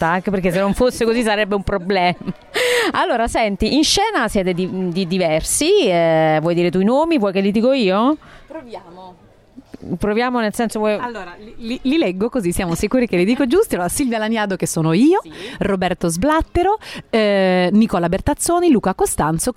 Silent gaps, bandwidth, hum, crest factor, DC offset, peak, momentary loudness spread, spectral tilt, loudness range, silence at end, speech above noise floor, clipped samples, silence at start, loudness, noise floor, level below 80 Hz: none; 16 kHz; none; 12 dB; under 0.1%; -4 dBFS; 9 LU; -4.5 dB/octave; 5 LU; 0.05 s; 27 dB; under 0.1%; 0 s; -17 LUFS; -44 dBFS; -38 dBFS